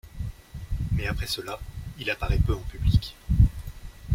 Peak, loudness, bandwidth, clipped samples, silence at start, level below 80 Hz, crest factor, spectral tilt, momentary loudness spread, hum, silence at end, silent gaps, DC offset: -6 dBFS; -28 LUFS; 16.5 kHz; under 0.1%; 0.05 s; -30 dBFS; 20 dB; -6 dB/octave; 17 LU; none; 0 s; none; under 0.1%